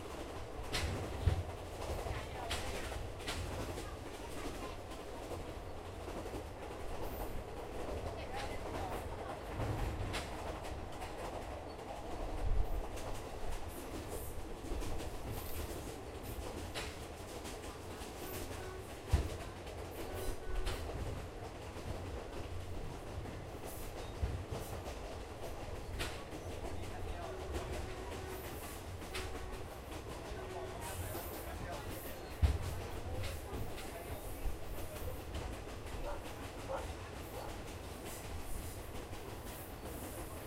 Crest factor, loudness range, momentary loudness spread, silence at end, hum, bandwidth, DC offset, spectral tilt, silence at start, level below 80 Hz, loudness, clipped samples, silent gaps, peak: 24 dB; 4 LU; 7 LU; 0 s; none; 16 kHz; under 0.1%; -5 dB/octave; 0 s; -46 dBFS; -44 LUFS; under 0.1%; none; -18 dBFS